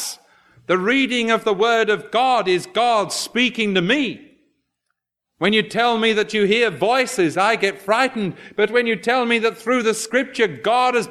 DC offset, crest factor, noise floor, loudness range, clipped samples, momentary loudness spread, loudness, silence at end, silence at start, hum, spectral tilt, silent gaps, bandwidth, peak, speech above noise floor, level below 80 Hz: under 0.1%; 16 dB; -77 dBFS; 2 LU; under 0.1%; 4 LU; -18 LUFS; 0 s; 0 s; none; -3.5 dB/octave; none; 14 kHz; -4 dBFS; 59 dB; -66 dBFS